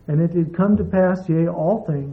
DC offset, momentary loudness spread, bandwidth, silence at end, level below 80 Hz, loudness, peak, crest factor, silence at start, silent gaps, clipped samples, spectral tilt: under 0.1%; 3 LU; 5.6 kHz; 0 s; -46 dBFS; -19 LUFS; -8 dBFS; 12 dB; 0.1 s; none; under 0.1%; -11.5 dB/octave